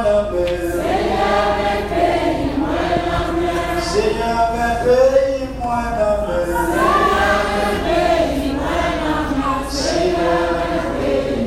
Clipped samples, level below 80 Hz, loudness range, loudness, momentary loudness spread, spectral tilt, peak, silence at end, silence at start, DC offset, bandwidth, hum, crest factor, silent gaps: under 0.1%; -30 dBFS; 2 LU; -18 LUFS; 5 LU; -5 dB/octave; -2 dBFS; 0 s; 0 s; under 0.1%; 16 kHz; none; 14 dB; none